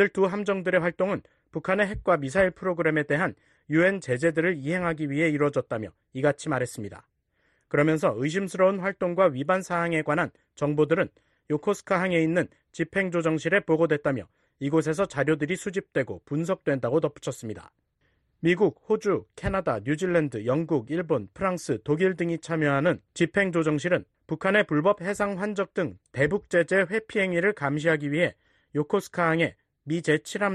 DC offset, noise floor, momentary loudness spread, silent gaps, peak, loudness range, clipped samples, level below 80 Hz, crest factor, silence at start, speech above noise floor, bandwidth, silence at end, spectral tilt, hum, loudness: under 0.1%; -71 dBFS; 8 LU; none; -8 dBFS; 3 LU; under 0.1%; -56 dBFS; 18 dB; 0 s; 45 dB; 12 kHz; 0 s; -6.5 dB/octave; none; -26 LUFS